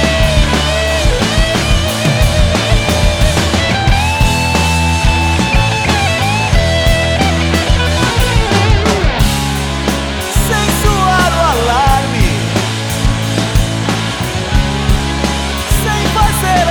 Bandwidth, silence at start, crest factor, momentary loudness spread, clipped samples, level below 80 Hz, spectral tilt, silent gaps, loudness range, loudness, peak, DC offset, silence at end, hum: over 20 kHz; 0 s; 12 dB; 4 LU; under 0.1%; -16 dBFS; -4.5 dB/octave; none; 2 LU; -12 LUFS; 0 dBFS; under 0.1%; 0 s; none